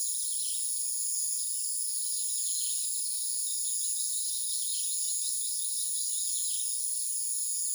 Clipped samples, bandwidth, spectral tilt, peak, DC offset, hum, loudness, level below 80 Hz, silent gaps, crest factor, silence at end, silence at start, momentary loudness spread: under 0.1%; over 20 kHz; 12 dB/octave; -18 dBFS; under 0.1%; none; -28 LUFS; under -90 dBFS; none; 14 dB; 0 s; 0 s; 1 LU